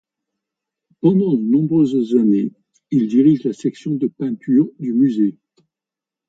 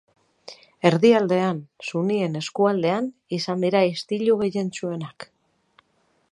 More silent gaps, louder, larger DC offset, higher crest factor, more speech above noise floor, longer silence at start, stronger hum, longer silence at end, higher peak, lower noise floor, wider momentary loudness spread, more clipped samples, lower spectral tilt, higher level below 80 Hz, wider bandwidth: neither; first, -17 LUFS vs -22 LUFS; neither; second, 16 dB vs 22 dB; first, 71 dB vs 45 dB; first, 1.05 s vs 0.5 s; neither; second, 0.95 s vs 1.1 s; about the same, -2 dBFS vs 0 dBFS; first, -88 dBFS vs -67 dBFS; second, 8 LU vs 19 LU; neither; first, -9.5 dB/octave vs -6 dB/octave; about the same, -66 dBFS vs -68 dBFS; second, 7.8 kHz vs 11.5 kHz